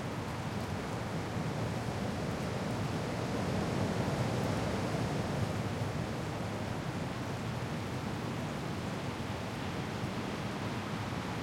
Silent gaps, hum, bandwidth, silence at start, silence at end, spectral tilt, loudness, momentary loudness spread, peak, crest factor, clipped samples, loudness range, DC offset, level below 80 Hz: none; none; 16.5 kHz; 0 s; 0 s; -6 dB/octave; -36 LUFS; 4 LU; -20 dBFS; 16 dB; under 0.1%; 3 LU; under 0.1%; -54 dBFS